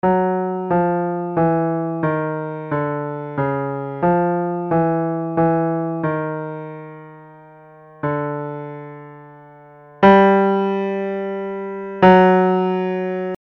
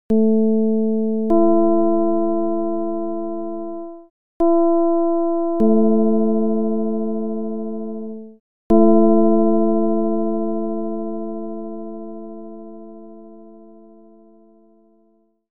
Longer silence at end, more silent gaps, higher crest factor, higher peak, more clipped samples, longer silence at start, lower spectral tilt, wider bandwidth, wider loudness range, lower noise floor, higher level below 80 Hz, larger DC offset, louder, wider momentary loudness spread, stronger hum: about the same, 0.05 s vs 0.1 s; second, none vs 4.10-4.40 s, 8.40-8.70 s; about the same, 18 dB vs 16 dB; first, 0 dBFS vs -4 dBFS; neither; about the same, 0.05 s vs 0.1 s; second, -9.5 dB/octave vs -12.5 dB/octave; first, 5.8 kHz vs 1.8 kHz; second, 11 LU vs 14 LU; second, -44 dBFS vs -60 dBFS; about the same, -52 dBFS vs -52 dBFS; second, under 0.1% vs 4%; about the same, -19 LUFS vs -19 LUFS; about the same, 16 LU vs 18 LU; neither